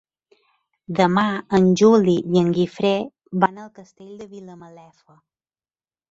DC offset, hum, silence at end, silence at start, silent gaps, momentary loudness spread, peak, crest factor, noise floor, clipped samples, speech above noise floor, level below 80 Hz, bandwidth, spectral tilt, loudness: under 0.1%; none; 1.45 s; 0.9 s; none; 24 LU; -2 dBFS; 20 dB; under -90 dBFS; under 0.1%; over 70 dB; -58 dBFS; 7.8 kHz; -6.5 dB/octave; -19 LUFS